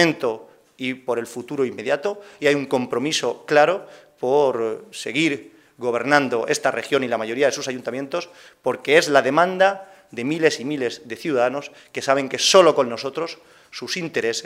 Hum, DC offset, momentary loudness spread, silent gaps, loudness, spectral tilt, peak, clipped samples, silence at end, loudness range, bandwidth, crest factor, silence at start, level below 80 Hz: none; under 0.1%; 13 LU; none; -21 LUFS; -3.5 dB/octave; 0 dBFS; under 0.1%; 0 s; 2 LU; 16 kHz; 22 dB; 0 s; -72 dBFS